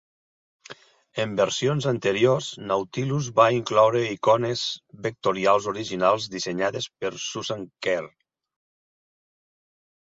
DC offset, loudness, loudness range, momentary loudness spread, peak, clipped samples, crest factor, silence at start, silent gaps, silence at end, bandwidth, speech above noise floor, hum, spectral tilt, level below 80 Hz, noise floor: under 0.1%; -24 LUFS; 8 LU; 10 LU; -4 dBFS; under 0.1%; 20 dB; 0.7 s; none; 2 s; 7.8 kHz; 24 dB; none; -4.5 dB/octave; -64 dBFS; -47 dBFS